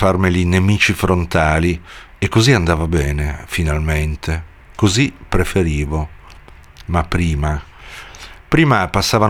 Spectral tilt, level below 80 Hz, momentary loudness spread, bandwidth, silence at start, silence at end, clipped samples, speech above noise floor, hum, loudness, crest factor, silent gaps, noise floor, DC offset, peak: -5.5 dB/octave; -26 dBFS; 16 LU; 16.5 kHz; 0 s; 0 s; under 0.1%; 24 dB; none; -17 LUFS; 16 dB; none; -40 dBFS; under 0.1%; 0 dBFS